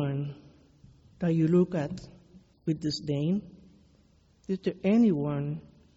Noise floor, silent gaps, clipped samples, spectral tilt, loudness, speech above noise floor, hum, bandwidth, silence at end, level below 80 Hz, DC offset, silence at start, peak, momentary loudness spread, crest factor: -63 dBFS; none; under 0.1%; -8 dB/octave; -29 LUFS; 36 dB; none; 8 kHz; 0.35 s; -60 dBFS; under 0.1%; 0 s; -14 dBFS; 16 LU; 16 dB